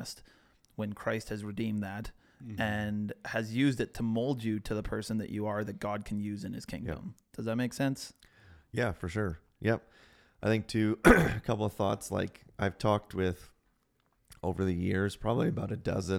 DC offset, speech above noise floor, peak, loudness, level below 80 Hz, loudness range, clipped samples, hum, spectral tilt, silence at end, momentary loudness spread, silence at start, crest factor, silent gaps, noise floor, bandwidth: under 0.1%; 42 dB; -8 dBFS; -33 LUFS; -48 dBFS; 7 LU; under 0.1%; none; -6.5 dB/octave; 0 s; 10 LU; 0 s; 26 dB; none; -74 dBFS; 16.5 kHz